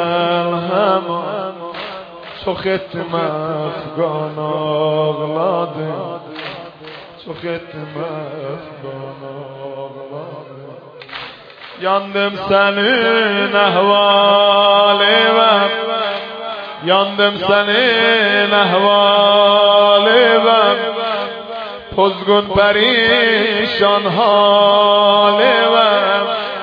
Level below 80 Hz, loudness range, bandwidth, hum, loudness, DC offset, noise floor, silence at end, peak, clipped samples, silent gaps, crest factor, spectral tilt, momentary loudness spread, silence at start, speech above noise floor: -52 dBFS; 16 LU; 5.2 kHz; none; -13 LUFS; under 0.1%; -36 dBFS; 0 s; 0 dBFS; under 0.1%; none; 14 dB; -6.5 dB/octave; 19 LU; 0 s; 22 dB